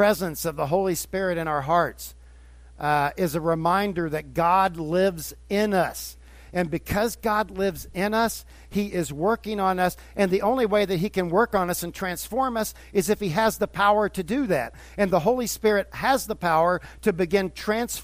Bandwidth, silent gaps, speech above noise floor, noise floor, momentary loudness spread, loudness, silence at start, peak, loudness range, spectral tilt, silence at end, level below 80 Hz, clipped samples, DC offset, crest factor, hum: 16 kHz; none; 23 dB; -47 dBFS; 7 LU; -24 LUFS; 0 s; -8 dBFS; 2 LU; -5 dB/octave; 0 s; -46 dBFS; under 0.1%; under 0.1%; 18 dB; none